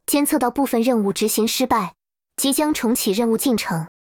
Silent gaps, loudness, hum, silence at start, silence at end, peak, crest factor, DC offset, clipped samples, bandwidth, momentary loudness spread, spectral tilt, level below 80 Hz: none; -20 LUFS; none; 0.1 s; 0.2 s; -4 dBFS; 16 dB; under 0.1%; under 0.1%; over 20 kHz; 4 LU; -3.5 dB/octave; -54 dBFS